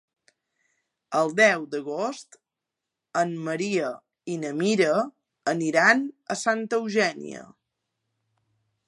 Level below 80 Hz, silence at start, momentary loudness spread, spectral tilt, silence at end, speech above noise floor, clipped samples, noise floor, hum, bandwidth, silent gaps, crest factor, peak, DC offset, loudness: -78 dBFS; 1.1 s; 15 LU; -4 dB/octave; 1.45 s; 62 dB; under 0.1%; -86 dBFS; none; 11.5 kHz; none; 22 dB; -6 dBFS; under 0.1%; -25 LUFS